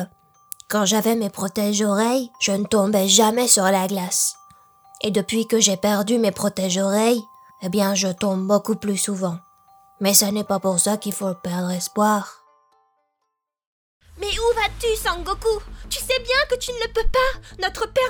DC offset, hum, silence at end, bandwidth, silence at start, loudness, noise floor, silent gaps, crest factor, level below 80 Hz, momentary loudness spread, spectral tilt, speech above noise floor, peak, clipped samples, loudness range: under 0.1%; none; 0 s; over 20 kHz; 0 s; -20 LUFS; -78 dBFS; 13.67-14.01 s; 20 dB; -40 dBFS; 11 LU; -3 dB/octave; 57 dB; 0 dBFS; under 0.1%; 7 LU